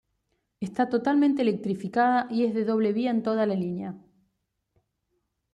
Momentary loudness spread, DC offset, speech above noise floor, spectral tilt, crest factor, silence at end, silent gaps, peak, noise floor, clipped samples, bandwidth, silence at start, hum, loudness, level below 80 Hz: 10 LU; under 0.1%; 53 dB; -7.5 dB/octave; 16 dB; 1.55 s; none; -12 dBFS; -78 dBFS; under 0.1%; 10 kHz; 0.6 s; none; -26 LUFS; -70 dBFS